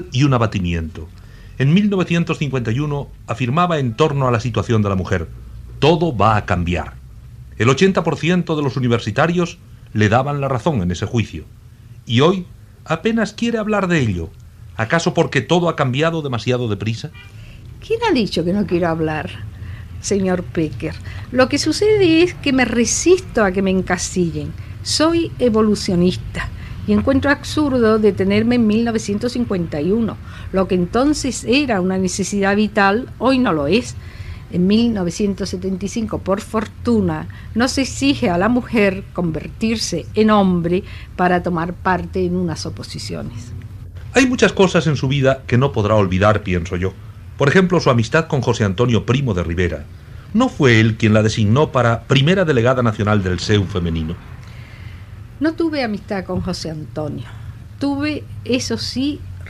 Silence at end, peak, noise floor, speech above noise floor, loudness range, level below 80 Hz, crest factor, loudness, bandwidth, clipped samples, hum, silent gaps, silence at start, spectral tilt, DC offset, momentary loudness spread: 0 s; 0 dBFS; -40 dBFS; 23 dB; 5 LU; -38 dBFS; 18 dB; -17 LUFS; 13 kHz; under 0.1%; none; none; 0 s; -5.5 dB/octave; under 0.1%; 14 LU